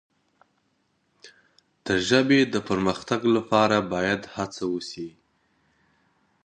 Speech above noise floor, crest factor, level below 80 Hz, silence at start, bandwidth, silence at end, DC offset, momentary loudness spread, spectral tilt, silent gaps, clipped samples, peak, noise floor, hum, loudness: 47 dB; 22 dB; -58 dBFS; 1.25 s; 9.8 kHz; 1.35 s; under 0.1%; 14 LU; -5 dB/octave; none; under 0.1%; -4 dBFS; -70 dBFS; none; -24 LUFS